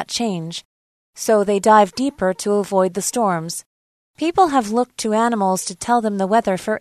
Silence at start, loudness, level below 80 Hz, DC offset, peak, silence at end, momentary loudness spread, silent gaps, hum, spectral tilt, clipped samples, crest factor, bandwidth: 0 s; -18 LUFS; -56 dBFS; under 0.1%; 0 dBFS; 0 s; 11 LU; 0.65-1.13 s, 3.66-4.14 s; none; -4.5 dB/octave; under 0.1%; 18 dB; 13.5 kHz